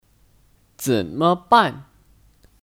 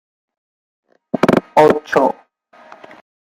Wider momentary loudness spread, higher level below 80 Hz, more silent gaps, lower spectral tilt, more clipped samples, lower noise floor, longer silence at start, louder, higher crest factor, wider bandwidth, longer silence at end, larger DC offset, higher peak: about the same, 12 LU vs 12 LU; about the same, -56 dBFS vs -58 dBFS; neither; second, -5 dB/octave vs -6.5 dB/octave; neither; first, -57 dBFS vs -48 dBFS; second, 0.8 s vs 1.15 s; second, -19 LUFS vs -15 LUFS; about the same, 22 dB vs 18 dB; first, 18 kHz vs 16 kHz; second, 0.85 s vs 1.2 s; neither; about the same, -2 dBFS vs 0 dBFS